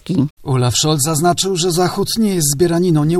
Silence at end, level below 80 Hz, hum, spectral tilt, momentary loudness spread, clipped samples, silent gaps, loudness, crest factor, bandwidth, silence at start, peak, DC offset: 0 s; -44 dBFS; none; -4.5 dB/octave; 4 LU; under 0.1%; 0.30-0.37 s; -15 LUFS; 14 dB; 16 kHz; 0.05 s; -2 dBFS; under 0.1%